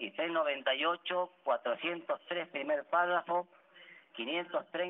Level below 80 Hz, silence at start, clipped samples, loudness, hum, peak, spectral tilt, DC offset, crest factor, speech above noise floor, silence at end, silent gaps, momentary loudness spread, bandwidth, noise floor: under -90 dBFS; 0 s; under 0.1%; -34 LUFS; none; -18 dBFS; 0 dB/octave; under 0.1%; 18 dB; 24 dB; 0 s; none; 7 LU; 4 kHz; -58 dBFS